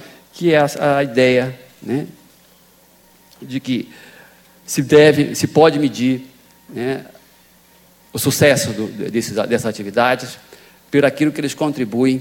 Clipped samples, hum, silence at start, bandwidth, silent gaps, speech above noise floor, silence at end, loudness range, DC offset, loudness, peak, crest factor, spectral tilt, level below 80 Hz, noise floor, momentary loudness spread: under 0.1%; none; 0 s; 17 kHz; none; 34 dB; 0 s; 5 LU; under 0.1%; -17 LUFS; 0 dBFS; 18 dB; -5 dB/octave; -58 dBFS; -51 dBFS; 14 LU